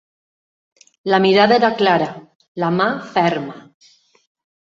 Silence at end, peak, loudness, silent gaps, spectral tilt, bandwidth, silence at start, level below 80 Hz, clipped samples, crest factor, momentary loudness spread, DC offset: 1.1 s; -2 dBFS; -16 LUFS; 2.35-2.40 s, 2.48-2.55 s; -6.5 dB/octave; 7.6 kHz; 1.05 s; -62 dBFS; under 0.1%; 18 dB; 15 LU; under 0.1%